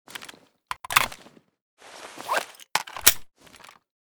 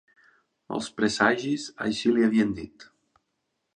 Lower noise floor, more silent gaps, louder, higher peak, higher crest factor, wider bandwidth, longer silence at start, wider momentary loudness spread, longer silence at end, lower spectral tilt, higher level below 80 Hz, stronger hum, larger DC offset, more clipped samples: second, -52 dBFS vs -79 dBFS; first, 1.62-1.77 s vs none; about the same, -23 LUFS vs -25 LUFS; first, 0 dBFS vs -6 dBFS; first, 30 dB vs 22 dB; first, over 20 kHz vs 10 kHz; second, 0.1 s vs 0.7 s; first, 24 LU vs 13 LU; about the same, 0.85 s vs 0.9 s; second, 0.5 dB/octave vs -4.5 dB/octave; about the same, -56 dBFS vs -60 dBFS; neither; neither; neither